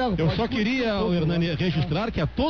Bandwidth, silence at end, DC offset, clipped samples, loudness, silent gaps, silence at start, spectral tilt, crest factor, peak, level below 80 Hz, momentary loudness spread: 6.6 kHz; 0 s; 0.4%; under 0.1%; -24 LUFS; none; 0 s; -7.5 dB/octave; 10 dB; -12 dBFS; -38 dBFS; 2 LU